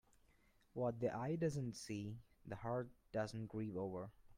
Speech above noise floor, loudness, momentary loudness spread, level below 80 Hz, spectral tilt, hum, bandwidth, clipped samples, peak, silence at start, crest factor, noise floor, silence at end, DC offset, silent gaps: 30 dB; -45 LUFS; 10 LU; -70 dBFS; -7 dB/octave; none; 16 kHz; under 0.1%; -28 dBFS; 0.75 s; 18 dB; -73 dBFS; 0 s; under 0.1%; none